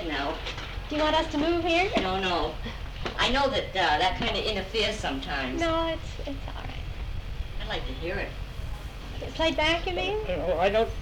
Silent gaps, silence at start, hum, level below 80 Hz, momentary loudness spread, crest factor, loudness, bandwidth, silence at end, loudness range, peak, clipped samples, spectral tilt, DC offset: none; 0 s; none; -38 dBFS; 14 LU; 16 dB; -28 LUFS; 18 kHz; 0 s; 7 LU; -12 dBFS; under 0.1%; -4.5 dB/octave; under 0.1%